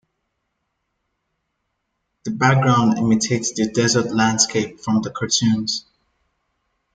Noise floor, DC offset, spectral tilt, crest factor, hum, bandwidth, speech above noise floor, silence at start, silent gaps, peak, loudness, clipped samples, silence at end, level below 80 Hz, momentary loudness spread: -75 dBFS; under 0.1%; -4 dB/octave; 20 dB; none; 9.6 kHz; 56 dB; 2.25 s; none; -2 dBFS; -18 LUFS; under 0.1%; 1.15 s; -58 dBFS; 8 LU